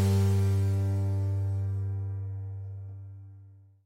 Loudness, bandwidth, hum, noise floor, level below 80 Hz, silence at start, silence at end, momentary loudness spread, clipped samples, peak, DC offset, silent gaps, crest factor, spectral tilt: -30 LUFS; 12.5 kHz; none; -53 dBFS; -66 dBFS; 0 s; 0.3 s; 19 LU; under 0.1%; -16 dBFS; under 0.1%; none; 12 dB; -8 dB/octave